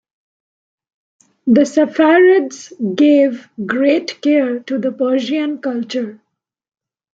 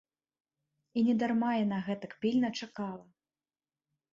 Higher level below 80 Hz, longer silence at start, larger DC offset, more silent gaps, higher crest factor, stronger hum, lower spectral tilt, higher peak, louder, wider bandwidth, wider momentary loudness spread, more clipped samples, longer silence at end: first, -66 dBFS vs -76 dBFS; first, 1.45 s vs 0.95 s; neither; neither; about the same, 14 dB vs 16 dB; neither; about the same, -5.5 dB/octave vs -6.5 dB/octave; first, -2 dBFS vs -18 dBFS; first, -15 LUFS vs -32 LUFS; about the same, 7.8 kHz vs 7.4 kHz; about the same, 13 LU vs 11 LU; neither; about the same, 1 s vs 1.1 s